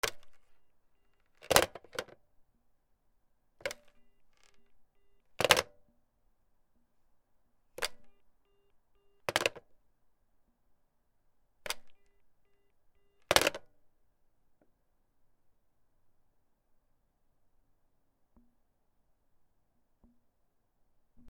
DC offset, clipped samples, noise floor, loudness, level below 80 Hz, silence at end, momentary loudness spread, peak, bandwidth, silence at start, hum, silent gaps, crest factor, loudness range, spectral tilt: under 0.1%; under 0.1%; -74 dBFS; -31 LUFS; -64 dBFS; 0 s; 17 LU; -2 dBFS; 19.5 kHz; 0.05 s; none; none; 40 dB; 14 LU; -1.5 dB/octave